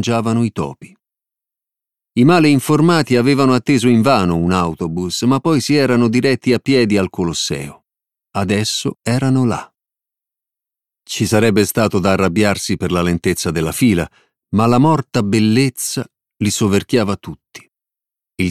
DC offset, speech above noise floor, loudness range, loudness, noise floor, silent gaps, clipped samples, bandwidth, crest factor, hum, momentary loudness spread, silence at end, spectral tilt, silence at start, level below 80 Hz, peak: under 0.1%; 72 dB; 5 LU; -15 LUFS; -87 dBFS; none; under 0.1%; 15 kHz; 16 dB; none; 10 LU; 0 s; -5.5 dB/octave; 0 s; -46 dBFS; 0 dBFS